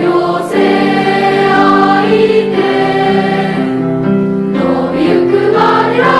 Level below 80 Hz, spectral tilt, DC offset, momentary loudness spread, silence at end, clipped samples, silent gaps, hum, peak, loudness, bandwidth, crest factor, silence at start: -46 dBFS; -7 dB/octave; under 0.1%; 5 LU; 0 s; under 0.1%; none; none; 0 dBFS; -10 LUFS; 12 kHz; 10 dB; 0 s